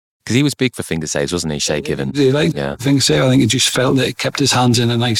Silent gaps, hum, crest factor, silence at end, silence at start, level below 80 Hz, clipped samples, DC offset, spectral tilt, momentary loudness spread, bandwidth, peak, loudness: none; none; 14 dB; 0 s; 0.25 s; -44 dBFS; under 0.1%; under 0.1%; -4.5 dB/octave; 7 LU; 17.5 kHz; -2 dBFS; -15 LUFS